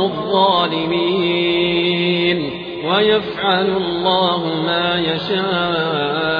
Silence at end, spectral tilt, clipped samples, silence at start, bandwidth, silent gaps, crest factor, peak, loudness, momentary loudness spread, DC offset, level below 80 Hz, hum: 0 s; -7.5 dB/octave; under 0.1%; 0 s; 5.2 kHz; none; 14 dB; -2 dBFS; -17 LUFS; 4 LU; under 0.1%; -52 dBFS; none